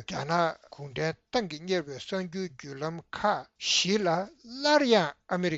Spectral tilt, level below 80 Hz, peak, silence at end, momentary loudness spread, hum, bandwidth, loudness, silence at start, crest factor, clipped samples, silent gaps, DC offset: -4 dB/octave; -64 dBFS; -10 dBFS; 0 s; 13 LU; none; 8 kHz; -29 LUFS; 0 s; 20 dB; under 0.1%; none; under 0.1%